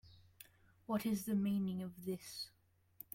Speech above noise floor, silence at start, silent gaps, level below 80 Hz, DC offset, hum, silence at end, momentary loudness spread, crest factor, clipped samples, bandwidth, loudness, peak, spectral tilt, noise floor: 24 dB; 0.05 s; none; -74 dBFS; under 0.1%; none; 0.65 s; 23 LU; 16 dB; under 0.1%; 16.5 kHz; -41 LUFS; -26 dBFS; -6 dB/octave; -64 dBFS